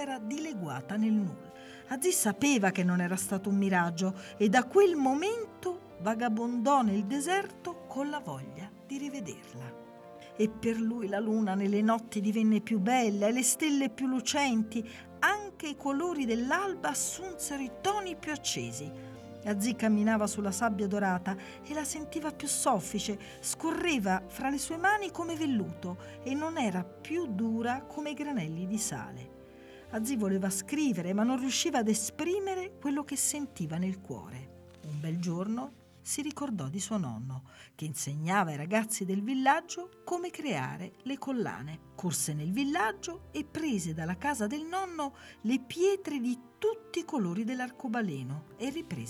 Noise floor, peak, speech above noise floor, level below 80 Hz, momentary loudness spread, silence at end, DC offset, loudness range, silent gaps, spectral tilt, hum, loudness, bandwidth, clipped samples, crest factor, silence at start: -51 dBFS; -12 dBFS; 20 dB; -66 dBFS; 14 LU; 0 s; under 0.1%; 6 LU; none; -4.5 dB/octave; none; -32 LUFS; 15.5 kHz; under 0.1%; 20 dB; 0 s